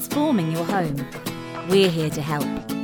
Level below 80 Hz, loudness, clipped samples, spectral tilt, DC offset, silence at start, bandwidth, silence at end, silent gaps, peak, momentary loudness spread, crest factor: -52 dBFS; -23 LUFS; under 0.1%; -5.5 dB/octave; under 0.1%; 0 s; 18 kHz; 0 s; none; -6 dBFS; 12 LU; 16 dB